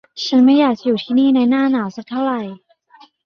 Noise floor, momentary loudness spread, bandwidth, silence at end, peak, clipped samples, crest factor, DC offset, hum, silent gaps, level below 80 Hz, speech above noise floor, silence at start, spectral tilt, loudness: -49 dBFS; 11 LU; 6.6 kHz; 0.7 s; -4 dBFS; under 0.1%; 14 dB; under 0.1%; none; none; -64 dBFS; 34 dB; 0.15 s; -5.5 dB/octave; -16 LUFS